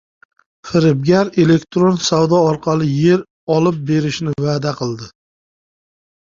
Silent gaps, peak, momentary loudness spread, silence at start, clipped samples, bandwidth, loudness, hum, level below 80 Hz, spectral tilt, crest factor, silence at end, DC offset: 3.30-3.47 s; -2 dBFS; 7 LU; 0.65 s; under 0.1%; 7.6 kHz; -16 LUFS; none; -52 dBFS; -6.5 dB/octave; 14 dB; 1.2 s; under 0.1%